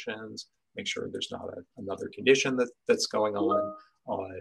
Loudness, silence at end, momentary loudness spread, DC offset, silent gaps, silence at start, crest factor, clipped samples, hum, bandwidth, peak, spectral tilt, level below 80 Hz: -29 LUFS; 0 s; 18 LU; under 0.1%; none; 0 s; 22 dB; under 0.1%; none; 12 kHz; -8 dBFS; -3.5 dB/octave; -74 dBFS